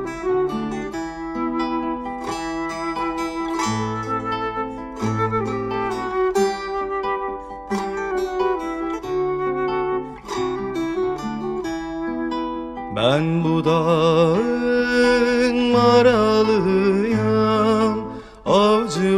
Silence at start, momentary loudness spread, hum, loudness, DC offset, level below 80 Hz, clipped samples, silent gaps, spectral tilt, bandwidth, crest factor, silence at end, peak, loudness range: 0 s; 11 LU; none; -21 LUFS; under 0.1%; -46 dBFS; under 0.1%; none; -6 dB/octave; 13.5 kHz; 16 dB; 0 s; -4 dBFS; 8 LU